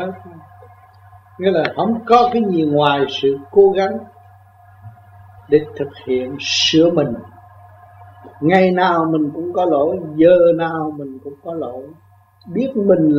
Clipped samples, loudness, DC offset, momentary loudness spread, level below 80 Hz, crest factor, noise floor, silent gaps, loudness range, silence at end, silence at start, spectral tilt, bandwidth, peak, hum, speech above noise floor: under 0.1%; -16 LUFS; under 0.1%; 15 LU; -56 dBFS; 18 dB; -46 dBFS; none; 3 LU; 0 s; 0 s; -5.5 dB/octave; 7.6 kHz; 0 dBFS; none; 30 dB